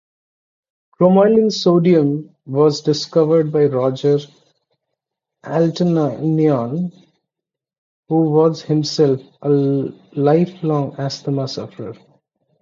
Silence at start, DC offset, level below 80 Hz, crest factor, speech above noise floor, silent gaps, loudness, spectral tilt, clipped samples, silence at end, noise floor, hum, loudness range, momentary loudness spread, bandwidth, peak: 1 s; under 0.1%; -62 dBFS; 16 dB; 69 dB; 7.78-8.03 s; -17 LUFS; -7.5 dB/octave; under 0.1%; 0.7 s; -85 dBFS; none; 5 LU; 11 LU; 7.6 kHz; -2 dBFS